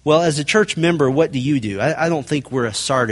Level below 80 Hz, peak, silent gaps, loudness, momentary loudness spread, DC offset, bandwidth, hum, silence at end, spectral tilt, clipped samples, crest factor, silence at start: -52 dBFS; -2 dBFS; none; -18 LUFS; 5 LU; under 0.1%; 11.5 kHz; none; 0 s; -5 dB/octave; under 0.1%; 16 dB; 0.05 s